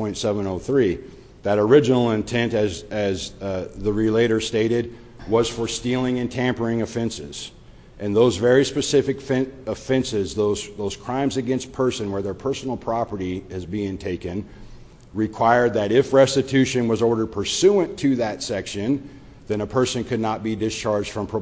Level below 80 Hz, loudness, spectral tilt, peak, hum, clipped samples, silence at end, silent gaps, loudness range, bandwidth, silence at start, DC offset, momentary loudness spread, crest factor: -46 dBFS; -22 LUFS; -5.5 dB/octave; -2 dBFS; none; under 0.1%; 0 s; none; 6 LU; 8 kHz; 0 s; under 0.1%; 11 LU; 18 dB